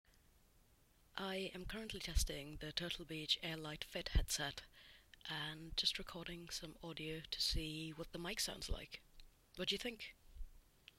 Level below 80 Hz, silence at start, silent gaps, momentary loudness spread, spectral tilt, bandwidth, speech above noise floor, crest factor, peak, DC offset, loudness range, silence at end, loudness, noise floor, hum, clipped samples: -50 dBFS; 1.15 s; none; 15 LU; -3 dB/octave; 16 kHz; 28 dB; 24 dB; -22 dBFS; under 0.1%; 3 LU; 0.4 s; -43 LUFS; -72 dBFS; none; under 0.1%